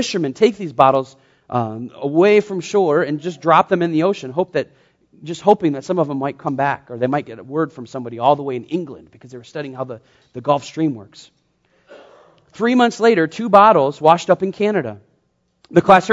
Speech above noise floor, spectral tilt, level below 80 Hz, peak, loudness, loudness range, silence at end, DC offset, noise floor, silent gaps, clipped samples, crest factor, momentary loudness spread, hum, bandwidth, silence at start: 48 dB; -6 dB/octave; -60 dBFS; 0 dBFS; -17 LUFS; 10 LU; 0 s; under 0.1%; -65 dBFS; none; under 0.1%; 18 dB; 16 LU; none; 8 kHz; 0 s